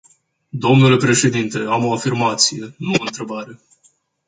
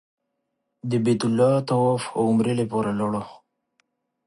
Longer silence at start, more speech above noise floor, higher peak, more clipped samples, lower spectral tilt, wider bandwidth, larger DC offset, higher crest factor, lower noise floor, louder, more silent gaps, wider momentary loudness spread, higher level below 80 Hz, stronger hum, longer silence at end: second, 0.55 s vs 0.85 s; second, 42 dB vs 56 dB; first, 0 dBFS vs -8 dBFS; neither; second, -4.5 dB/octave vs -7 dB/octave; second, 9.6 kHz vs 11.5 kHz; neither; about the same, 18 dB vs 16 dB; second, -59 dBFS vs -78 dBFS; first, -16 LUFS vs -23 LUFS; neither; first, 16 LU vs 9 LU; first, -56 dBFS vs -62 dBFS; neither; second, 0.75 s vs 0.9 s